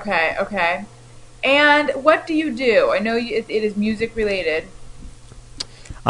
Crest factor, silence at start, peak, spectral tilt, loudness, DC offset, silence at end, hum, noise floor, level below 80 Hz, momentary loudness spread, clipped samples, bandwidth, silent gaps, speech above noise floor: 20 dB; 0 s; 0 dBFS; -4.5 dB/octave; -18 LUFS; under 0.1%; 0 s; none; -39 dBFS; -44 dBFS; 14 LU; under 0.1%; 11 kHz; none; 21 dB